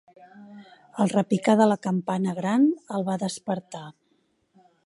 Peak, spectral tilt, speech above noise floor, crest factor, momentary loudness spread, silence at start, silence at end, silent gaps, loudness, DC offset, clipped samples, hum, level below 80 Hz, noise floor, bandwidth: -6 dBFS; -6.5 dB/octave; 45 dB; 20 dB; 18 LU; 0.35 s; 0.95 s; none; -24 LUFS; under 0.1%; under 0.1%; none; -74 dBFS; -69 dBFS; 11.5 kHz